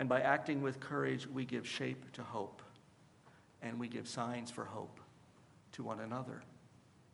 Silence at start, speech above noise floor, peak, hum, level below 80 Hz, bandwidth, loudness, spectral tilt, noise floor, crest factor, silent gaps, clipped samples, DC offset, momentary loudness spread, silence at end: 0 s; 25 dB; -18 dBFS; none; -82 dBFS; 11.5 kHz; -41 LUFS; -5.5 dB/octave; -65 dBFS; 24 dB; none; under 0.1%; under 0.1%; 18 LU; 0.1 s